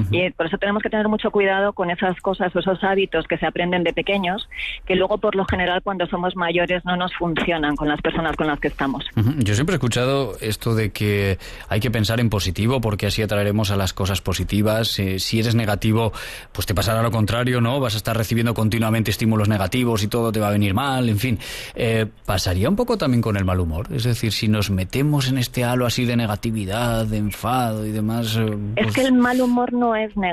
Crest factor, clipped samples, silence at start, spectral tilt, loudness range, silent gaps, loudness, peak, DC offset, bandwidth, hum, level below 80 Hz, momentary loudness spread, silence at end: 12 dB; under 0.1%; 0 s; -5.5 dB/octave; 1 LU; none; -21 LUFS; -8 dBFS; under 0.1%; 14 kHz; none; -40 dBFS; 4 LU; 0 s